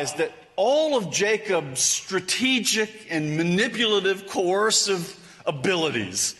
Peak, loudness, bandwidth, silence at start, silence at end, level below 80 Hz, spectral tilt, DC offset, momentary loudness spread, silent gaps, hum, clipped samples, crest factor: -8 dBFS; -23 LUFS; 12 kHz; 0 s; 0.05 s; -66 dBFS; -2.5 dB/octave; under 0.1%; 8 LU; none; none; under 0.1%; 16 dB